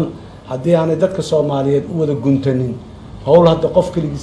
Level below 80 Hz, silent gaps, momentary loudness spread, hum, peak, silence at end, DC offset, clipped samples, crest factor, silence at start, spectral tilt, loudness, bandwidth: -40 dBFS; none; 16 LU; none; 0 dBFS; 0 s; under 0.1%; under 0.1%; 16 dB; 0 s; -8 dB/octave; -15 LUFS; 11 kHz